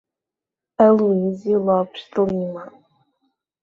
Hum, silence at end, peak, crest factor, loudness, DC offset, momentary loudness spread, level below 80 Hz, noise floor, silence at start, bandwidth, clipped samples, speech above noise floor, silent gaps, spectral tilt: none; 0.95 s; -2 dBFS; 18 dB; -19 LUFS; under 0.1%; 15 LU; -60 dBFS; -87 dBFS; 0.8 s; 7 kHz; under 0.1%; 69 dB; none; -9 dB/octave